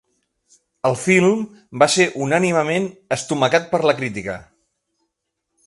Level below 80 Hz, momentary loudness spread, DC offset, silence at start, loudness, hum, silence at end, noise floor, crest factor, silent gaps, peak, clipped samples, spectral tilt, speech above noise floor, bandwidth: -58 dBFS; 11 LU; under 0.1%; 0.85 s; -18 LUFS; none; 1.25 s; -77 dBFS; 20 dB; none; 0 dBFS; under 0.1%; -4.5 dB/octave; 59 dB; 11.5 kHz